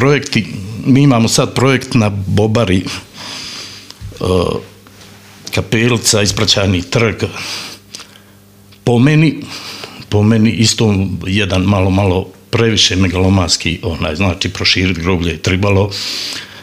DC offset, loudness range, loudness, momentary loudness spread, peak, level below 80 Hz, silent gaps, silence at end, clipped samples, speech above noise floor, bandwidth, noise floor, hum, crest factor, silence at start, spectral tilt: under 0.1%; 4 LU; -13 LUFS; 15 LU; 0 dBFS; -38 dBFS; none; 0 s; under 0.1%; 30 dB; 15.5 kHz; -42 dBFS; none; 14 dB; 0 s; -4.5 dB/octave